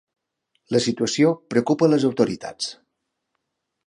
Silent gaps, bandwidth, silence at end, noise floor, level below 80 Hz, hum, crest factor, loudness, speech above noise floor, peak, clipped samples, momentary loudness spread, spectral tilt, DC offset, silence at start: none; 11 kHz; 1.15 s; -78 dBFS; -64 dBFS; none; 20 dB; -21 LUFS; 58 dB; -4 dBFS; under 0.1%; 11 LU; -5 dB/octave; under 0.1%; 0.7 s